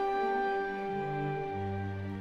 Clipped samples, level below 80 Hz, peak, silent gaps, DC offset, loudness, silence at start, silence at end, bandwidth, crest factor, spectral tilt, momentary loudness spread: under 0.1%; -60 dBFS; -22 dBFS; none; under 0.1%; -34 LUFS; 0 s; 0 s; 7.4 kHz; 12 dB; -8 dB/octave; 6 LU